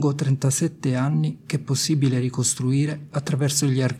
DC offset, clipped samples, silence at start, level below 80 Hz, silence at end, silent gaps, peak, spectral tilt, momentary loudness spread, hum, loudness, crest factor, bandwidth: under 0.1%; under 0.1%; 0 s; -62 dBFS; 0 s; none; -8 dBFS; -5 dB/octave; 5 LU; none; -22 LUFS; 14 dB; 15.5 kHz